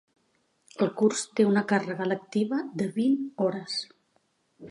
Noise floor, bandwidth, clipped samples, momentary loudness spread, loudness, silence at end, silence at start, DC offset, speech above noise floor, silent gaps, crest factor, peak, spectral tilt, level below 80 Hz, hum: -71 dBFS; 11.5 kHz; under 0.1%; 9 LU; -27 LUFS; 0 s; 0.8 s; under 0.1%; 44 dB; none; 18 dB; -10 dBFS; -5 dB/octave; -76 dBFS; none